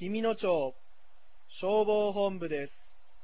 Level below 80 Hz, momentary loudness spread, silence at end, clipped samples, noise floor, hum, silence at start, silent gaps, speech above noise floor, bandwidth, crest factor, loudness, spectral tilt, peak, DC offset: -68 dBFS; 10 LU; 0.55 s; under 0.1%; -64 dBFS; none; 0 s; none; 34 dB; 4 kHz; 14 dB; -31 LUFS; -4.5 dB/octave; -16 dBFS; 0.8%